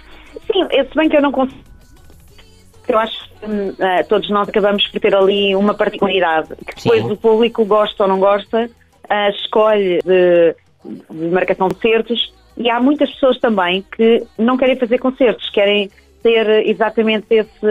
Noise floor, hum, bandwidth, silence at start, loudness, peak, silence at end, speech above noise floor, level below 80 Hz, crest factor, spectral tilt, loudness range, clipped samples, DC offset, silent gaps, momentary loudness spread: -43 dBFS; none; 8.2 kHz; 0.1 s; -15 LUFS; -2 dBFS; 0 s; 29 dB; -48 dBFS; 14 dB; -6.5 dB/octave; 4 LU; under 0.1%; under 0.1%; none; 9 LU